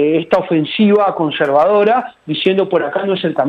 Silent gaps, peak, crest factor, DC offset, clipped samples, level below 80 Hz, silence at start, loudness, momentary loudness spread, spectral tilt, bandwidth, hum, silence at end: none; -2 dBFS; 12 dB; under 0.1%; under 0.1%; -58 dBFS; 0 s; -14 LUFS; 6 LU; -8 dB/octave; 6.6 kHz; none; 0 s